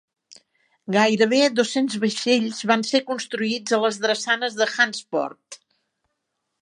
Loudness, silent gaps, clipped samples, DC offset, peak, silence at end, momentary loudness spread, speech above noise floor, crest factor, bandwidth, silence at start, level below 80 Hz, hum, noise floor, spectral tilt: -21 LUFS; none; under 0.1%; under 0.1%; -4 dBFS; 1.05 s; 9 LU; 56 dB; 20 dB; 11.5 kHz; 0.3 s; -76 dBFS; none; -78 dBFS; -3.5 dB/octave